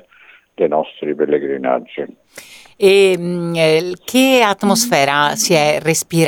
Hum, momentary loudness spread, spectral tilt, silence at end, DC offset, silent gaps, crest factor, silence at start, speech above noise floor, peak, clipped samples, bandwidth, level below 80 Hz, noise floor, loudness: none; 9 LU; -4 dB/octave; 0 s; under 0.1%; none; 16 dB; 0.6 s; 32 dB; 0 dBFS; under 0.1%; 19.5 kHz; -60 dBFS; -47 dBFS; -14 LUFS